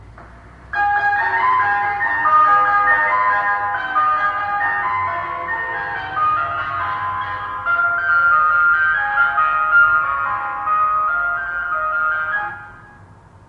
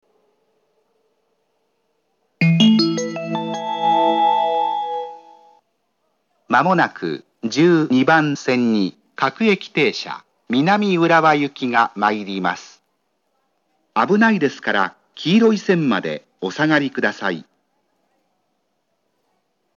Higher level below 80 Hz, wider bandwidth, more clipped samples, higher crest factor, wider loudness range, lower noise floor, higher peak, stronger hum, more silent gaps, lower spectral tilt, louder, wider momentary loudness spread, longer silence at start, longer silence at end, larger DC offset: first, -50 dBFS vs -84 dBFS; second, 6.4 kHz vs 7.4 kHz; neither; second, 14 dB vs 20 dB; about the same, 5 LU vs 4 LU; second, -44 dBFS vs -70 dBFS; second, -4 dBFS vs 0 dBFS; neither; neither; about the same, -5 dB/octave vs -5.5 dB/octave; about the same, -17 LUFS vs -18 LUFS; about the same, 10 LU vs 12 LU; second, 0 s vs 2.4 s; second, 0.45 s vs 2.35 s; neither